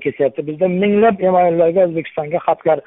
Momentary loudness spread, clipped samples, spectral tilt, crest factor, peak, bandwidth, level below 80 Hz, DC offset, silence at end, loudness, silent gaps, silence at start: 6 LU; under 0.1%; -12 dB/octave; 12 dB; -2 dBFS; 3.9 kHz; -58 dBFS; under 0.1%; 0.05 s; -16 LUFS; none; 0 s